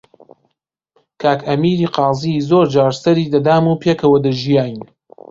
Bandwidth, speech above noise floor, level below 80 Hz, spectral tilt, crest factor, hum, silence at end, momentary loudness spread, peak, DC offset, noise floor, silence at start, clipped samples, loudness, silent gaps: 7.6 kHz; 58 dB; -52 dBFS; -7.5 dB/octave; 14 dB; none; 0.45 s; 5 LU; 0 dBFS; under 0.1%; -72 dBFS; 1.2 s; under 0.1%; -15 LUFS; none